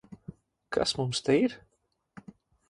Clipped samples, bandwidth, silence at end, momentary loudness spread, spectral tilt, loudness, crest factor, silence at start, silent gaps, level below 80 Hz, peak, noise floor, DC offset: under 0.1%; 11.5 kHz; 0.5 s; 24 LU; -4.5 dB/octave; -28 LUFS; 20 dB; 0.1 s; none; -62 dBFS; -12 dBFS; -76 dBFS; under 0.1%